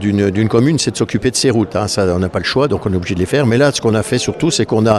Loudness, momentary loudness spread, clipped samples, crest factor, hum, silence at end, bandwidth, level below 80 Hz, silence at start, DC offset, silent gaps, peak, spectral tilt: -15 LUFS; 4 LU; under 0.1%; 14 dB; none; 0 s; 13.5 kHz; -40 dBFS; 0 s; under 0.1%; none; 0 dBFS; -5 dB/octave